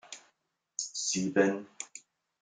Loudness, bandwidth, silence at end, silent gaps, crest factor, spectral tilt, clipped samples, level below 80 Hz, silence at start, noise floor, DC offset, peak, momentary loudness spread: -31 LUFS; 10 kHz; 0.45 s; none; 24 dB; -3.5 dB/octave; under 0.1%; -78 dBFS; 0.05 s; -77 dBFS; under 0.1%; -10 dBFS; 21 LU